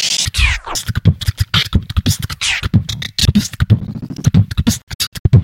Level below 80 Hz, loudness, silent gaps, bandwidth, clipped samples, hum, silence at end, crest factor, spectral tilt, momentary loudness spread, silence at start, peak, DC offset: -24 dBFS; -16 LUFS; 4.83-4.87 s, 4.95-4.99 s, 5.07-5.12 s, 5.19-5.25 s; 16.5 kHz; under 0.1%; none; 0 s; 14 dB; -4 dB/octave; 5 LU; 0 s; 0 dBFS; under 0.1%